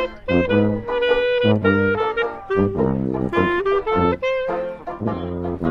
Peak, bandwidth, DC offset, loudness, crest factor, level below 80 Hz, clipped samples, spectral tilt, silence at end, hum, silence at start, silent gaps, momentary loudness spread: -4 dBFS; 6.6 kHz; under 0.1%; -20 LUFS; 16 dB; -42 dBFS; under 0.1%; -8.5 dB/octave; 0 s; none; 0 s; none; 9 LU